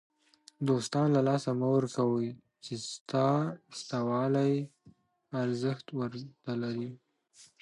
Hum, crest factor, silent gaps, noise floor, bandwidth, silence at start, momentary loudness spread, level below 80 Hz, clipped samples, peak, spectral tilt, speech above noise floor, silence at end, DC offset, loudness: none; 16 dB; 3.01-3.06 s; -62 dBFS; 11.5 kHz; 0.6 s; 12 LU; -76 dBFS; under 0.1%; -16 dBFS; -6.5 dB/octave; 31 dB; 0.15 s; under 0.1%; -31 LUFS